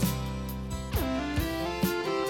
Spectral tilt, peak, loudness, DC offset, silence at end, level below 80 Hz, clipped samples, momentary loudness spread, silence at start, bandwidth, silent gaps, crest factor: -5.5 dB/octave; -14 dBFS; -31 LUFS; under 0.1%; 0 s; -38 dBFS; under 0.1%; 6 LU; 0 s; 19 kHz; none; 16 dB